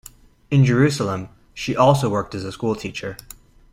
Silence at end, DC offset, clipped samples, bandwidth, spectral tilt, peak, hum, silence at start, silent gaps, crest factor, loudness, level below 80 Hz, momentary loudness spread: 0.6 s; under 0.1%; under 0.1%; 15.5 kHz; -6.5 dB/octave; -2 dBFS; none; 0.5 s; none; 18 dB; -20 LUFS; -48 dBFS; 15 LU